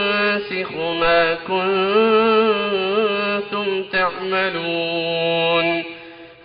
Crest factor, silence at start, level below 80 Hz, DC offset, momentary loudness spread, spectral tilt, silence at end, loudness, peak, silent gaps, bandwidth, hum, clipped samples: 16 dB; 0 s; -52 dBFS; under 0.1%; 7 LU; -1.5 dB/octave; 0.1 s; -19 LUFS; -2 dBFS; none; 5.2 kHz; none; under 0.1%